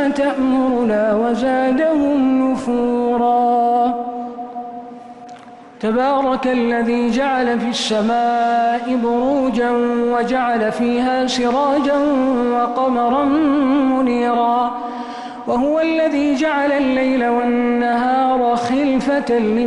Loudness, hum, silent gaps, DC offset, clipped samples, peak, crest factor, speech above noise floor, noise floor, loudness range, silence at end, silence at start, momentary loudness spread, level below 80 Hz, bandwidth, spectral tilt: -17 LUFS; none; none; under 0.1%; under 0.1%; -8 dBFS; 10 dB; 22 dB; -38 dBFS; 3 LU; 0 s; 0 s; 9 LU; -50 dBFS; 10.5 kHz; -5 dB/octave